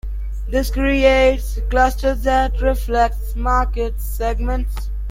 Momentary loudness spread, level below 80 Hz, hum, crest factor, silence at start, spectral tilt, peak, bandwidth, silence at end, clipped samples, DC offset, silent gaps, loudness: 10 LU; -22 dBFS; none; 16 dB; 0.05 s; -6 dB/octave; -2 dBFS; 16.5 kHz; 0 s; under 0.1%; under 0.1%; none; -19 LUFS